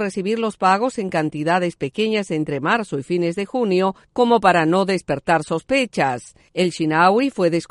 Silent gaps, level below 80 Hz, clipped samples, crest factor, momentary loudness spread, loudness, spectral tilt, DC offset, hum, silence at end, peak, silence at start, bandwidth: none; -56 dBFS; under 0.1%; 18 dB; 7 LU; -19 LUFS; -5.5 dB/octave; under 0.1%; none; 0.05 s; -2 dBFS; 0 s; 11.5 kHz